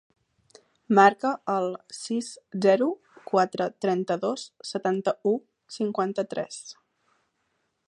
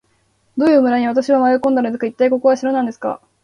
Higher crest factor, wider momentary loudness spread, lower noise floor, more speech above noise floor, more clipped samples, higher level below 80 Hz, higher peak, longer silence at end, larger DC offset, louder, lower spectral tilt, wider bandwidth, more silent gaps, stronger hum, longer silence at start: first, 24 dB vs 14 dB; first, 16 LU vs 9 LU; first, -75 dBFS vs -61 dBFS; first, 50 dB vs 46 dB; neither; second, -78 dBFS vs -62 dBFS; about the same, -4 dBFS vs -2 dBFS; first, 1.15 s vs 0.25 s; neither; second, -26 LUFS vs -16 LUFS; about the same, -5 dB/octave vs -5.5 dB/octave; about the same, 11 kHz vs 10 kHz; neither; neither; first, 0.9 s vs 0.55 s